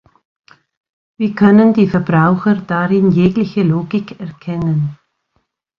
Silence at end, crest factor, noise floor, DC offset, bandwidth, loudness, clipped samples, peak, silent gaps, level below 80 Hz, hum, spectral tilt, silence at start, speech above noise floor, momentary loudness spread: 0.85 s; 14 dB; -66 dBFS; under 0.1%; 5.8 kHz; -14 LUFS; under 0.1%; 0 dBFS; none; -48 dBFS; none; -10 dB/octave; 1.2 s; 53 dB; 12 LU